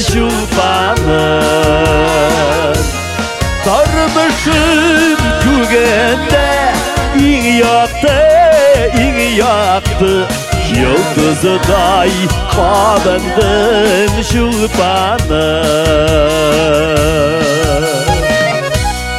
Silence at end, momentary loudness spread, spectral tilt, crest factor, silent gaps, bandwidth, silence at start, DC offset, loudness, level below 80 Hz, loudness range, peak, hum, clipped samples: 0 s; 4 LU; -4.5 dB/octave; 10 dB; none; 16.5 kHz; 0 s; under 0.1%; -10 LUFS; -22 dBFS; 2 LU; 0 dBFS; none; under 0.1%